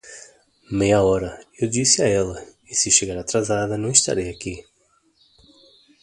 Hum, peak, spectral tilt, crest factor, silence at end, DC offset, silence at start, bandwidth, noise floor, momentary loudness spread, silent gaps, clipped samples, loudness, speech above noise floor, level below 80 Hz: none; 0 dBFS; -3 dB/octave; 22 dB; 1.4 s; under 0.1%; 0.05 s; 11.5 kHz; -63 dBFS; 16 LU; none; under 0.1%; -19 LUFS; 42 dB; -46 dBFS